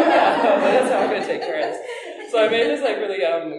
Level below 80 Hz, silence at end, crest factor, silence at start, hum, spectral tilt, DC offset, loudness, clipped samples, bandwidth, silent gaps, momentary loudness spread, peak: -70 dBFS; 0 s; 16 dB; 0 s; none; -4 dB/octave; under 0.1%; -19 LUFS; under 0.1%; 11.5 kHz; none; 10 LU; -4 dBFS